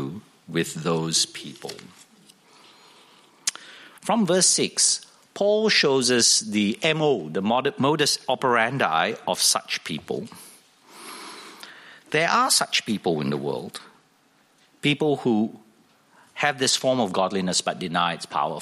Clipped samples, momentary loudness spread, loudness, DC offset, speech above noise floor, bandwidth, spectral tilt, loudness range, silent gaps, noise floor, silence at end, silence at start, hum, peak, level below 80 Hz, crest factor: under 0.1%; 20 LU; -22 LUFS; under 0.1%; 38 dB; 15 kHz; -2.5 dB/octave; 8 LU; none; -61 dBFS; 0 s; 0 s; none; -6 dBFS; -70 dBFS; 20 dB